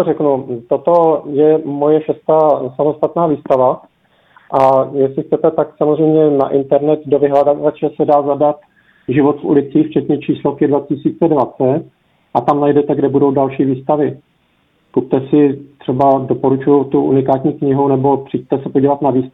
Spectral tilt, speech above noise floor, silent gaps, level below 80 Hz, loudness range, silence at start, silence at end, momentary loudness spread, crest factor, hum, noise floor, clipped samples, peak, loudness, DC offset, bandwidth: -10.5 dB/octave; 45 dB; none; -56 dBFS; 2 LU; 0 s; 0.05 s; 6 LU; 14 dB; none; -58 dBFS; under 0.1%; 0 dBFS; -14 LUFS; under 0.1%; 4.6 kHz